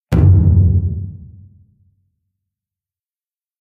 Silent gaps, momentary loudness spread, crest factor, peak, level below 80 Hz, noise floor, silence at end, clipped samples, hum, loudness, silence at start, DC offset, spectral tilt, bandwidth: none; 16 LU; 16 dB; -2 dBFS; -26 dBFS; under -90 dBFS; 2.35 s; under 0.1%; none; -13 LUFS; 0.1 s; under 0.1%; -10 dB/octave; 3.4 kHz